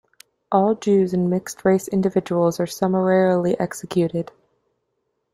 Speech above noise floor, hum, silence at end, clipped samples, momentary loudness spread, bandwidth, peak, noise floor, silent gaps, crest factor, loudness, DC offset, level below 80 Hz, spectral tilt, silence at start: 54 dB; none; 1.1 s; under 0.1%; 6 LU; 15.5 kHz; -4 dBFS; -74 dBFS; none; 18 dB; -20 LUFS; under 0.1%; -60 dBFS; -7 dB/octave; 0.5 s